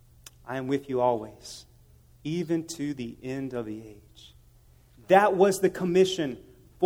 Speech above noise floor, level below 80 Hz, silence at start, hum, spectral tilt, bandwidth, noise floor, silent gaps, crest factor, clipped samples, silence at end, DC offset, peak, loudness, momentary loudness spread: 30 dB; -60 dBFS; 0.45 s; none; -5.5 dB/octave; 16.5 kHz; -57 dBFS; none; 24 dB; under 0.1%; 0 s; under 0.1%; -4 dBFS; -26 LUFS; 21 LU